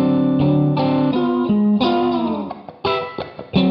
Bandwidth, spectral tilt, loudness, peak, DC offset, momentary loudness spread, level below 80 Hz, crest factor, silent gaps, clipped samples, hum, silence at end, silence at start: 5.8 kHz; -9.5 dB/octave; -18 LUFS; -4 dBFS; under 0.1%; 10 LU; -48 dBFS; 14 dB; none; under 0.1%; none; 0 s; 0 s